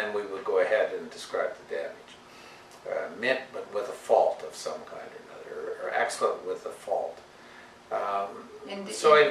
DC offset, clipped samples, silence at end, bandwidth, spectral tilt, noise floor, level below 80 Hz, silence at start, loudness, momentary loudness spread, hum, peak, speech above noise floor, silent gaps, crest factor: under 0.1%; under 0.1%; 0 s; 13.5 kHz; -2.5 dB/octave; -50 dBFS; -74 dBFS; 0 s; -29 LUFS; 23 LU; none; -6 dBFS; 26 dB; none; 24 dB